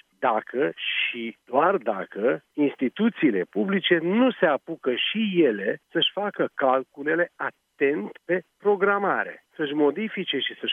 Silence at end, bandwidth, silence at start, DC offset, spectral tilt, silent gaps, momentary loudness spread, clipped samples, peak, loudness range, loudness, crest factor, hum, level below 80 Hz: 0 s; 3.9 kHz; 0.2 s; under 0.1%; -7.5 dB/octave; none; 7 LU; under 0.1%; -6 dBFS; 2 LU; -24 LUFS; 18 dB; none; -82 dBFS